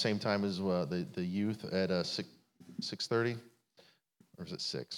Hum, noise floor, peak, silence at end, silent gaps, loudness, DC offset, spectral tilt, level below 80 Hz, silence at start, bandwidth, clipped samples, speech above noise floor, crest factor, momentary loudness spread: none; -68 dBFS; -16 dBFS; 0 s; none; -36 LUFS; under 0.1%; -5.5 dB/octave; -80 dBFS; 0 s; 15.5 kHz; under 0.1%; 33 dB; 20 dB; 13 LU